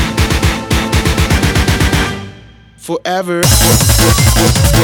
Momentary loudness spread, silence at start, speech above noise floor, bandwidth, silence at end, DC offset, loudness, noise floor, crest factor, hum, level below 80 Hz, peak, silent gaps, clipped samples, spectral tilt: 11 LU; 0 s; 28 dB; over 20 kHz; 0 s; under 0.1%; -11 LUFS; -38 dBFS; 12 dB; none; -18 dBFS; 0 dBFS; none; under 0.1%; -4 dB/octave